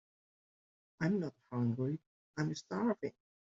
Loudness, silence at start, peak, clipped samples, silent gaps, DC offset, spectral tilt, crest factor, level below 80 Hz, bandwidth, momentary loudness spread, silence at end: -38 LUFS; 1 s; -22 dBFS; under 0.1%; 2.07-2.34 s; under 0.1%; -7 dB/octave; 18 dB; -76 dBFS; 7.8 kHz; 9 LU; 0.4 s